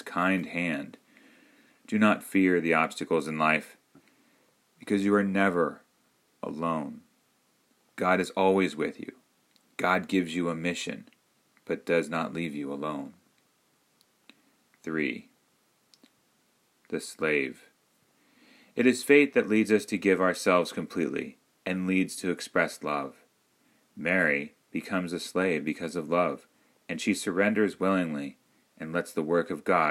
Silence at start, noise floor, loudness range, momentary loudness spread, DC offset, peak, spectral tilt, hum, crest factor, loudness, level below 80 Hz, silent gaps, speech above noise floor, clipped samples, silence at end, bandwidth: 0.05 s; -69 dBFS; 10 LU; 14 LU; under 0.1%; -6 dBFS; -5.5 dB/octave; none; 22 dB; -28 LUFS; -72 dBFS; none; 42 dB; under 0.1%; 0 s; 16 kHz